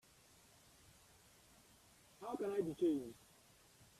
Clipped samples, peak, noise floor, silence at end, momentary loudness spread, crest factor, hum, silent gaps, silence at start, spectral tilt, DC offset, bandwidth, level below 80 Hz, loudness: under 0.1%; -28 dBFS; -68 dBFS; 0.15 s; 27 LU; 18 dB; none; none; 2.2 s; -6.5 dB/octave; under 0.1%; 14.5 kHz; -76 dBFS; -42 LUFS